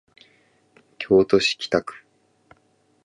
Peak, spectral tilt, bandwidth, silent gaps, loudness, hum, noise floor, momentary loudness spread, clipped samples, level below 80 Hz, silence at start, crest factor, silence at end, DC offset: -2 dBFS; -4.5 dB/octave; 10.5 kHz; none; -20 LUFS; none; -63 dBFS; 18 LU; under 0.1%; -58 dBFS; 1 s; 22 dB; 1.15 s; under 0.1%